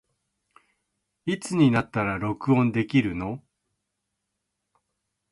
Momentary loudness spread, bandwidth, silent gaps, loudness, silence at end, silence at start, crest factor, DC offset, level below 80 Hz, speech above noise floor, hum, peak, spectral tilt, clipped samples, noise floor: 13 LU; 11.5 kHz; none; -25 LUFS; 1.95 s; 1.25 s; 20 dB; under 0.1%; -54 dBFS; 57 dB; none; -8 dBFS; -7 dB/octave; under 0.1%; -81 dBFS